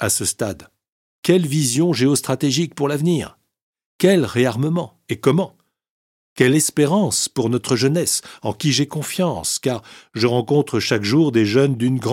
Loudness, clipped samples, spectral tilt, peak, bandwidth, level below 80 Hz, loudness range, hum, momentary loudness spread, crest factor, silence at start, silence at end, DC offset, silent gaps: -19 LUFS; under 0.1%; -4.5 dB/octave; 0 dBFS; 16.5 kHz; -56 dBFS; 2 LU; none; 9 LU; 18 dB; 0 s; 0 s; under 0.1%; 0.88-1.23 s, 3.62-3.73 s, 3.86-3.99 s, 5.90-6.36 s